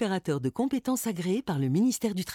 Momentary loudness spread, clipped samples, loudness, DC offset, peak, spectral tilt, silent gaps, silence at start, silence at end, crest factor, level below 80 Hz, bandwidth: 4 LU; under 0.1%; -28 LUFS; under 0.1%; -16 dBFS; -5.5 dB/octave; none; 0 s; 0 s; 12 dB; -64 dBFS; 18 kHz